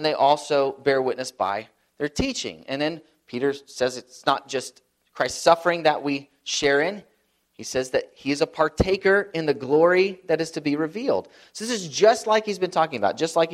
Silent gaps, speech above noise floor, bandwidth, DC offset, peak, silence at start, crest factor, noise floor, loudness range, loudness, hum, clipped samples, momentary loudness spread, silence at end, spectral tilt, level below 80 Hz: none; 44 dB; 14 kHz; under 0.1%; -2 dBFS; 0 s; 22 dB; -67 dBFS; 5 LU; -23 LUFS; none; under 0.1%; 11 LU; 0 s; -4 dB/octave; -50 dBFS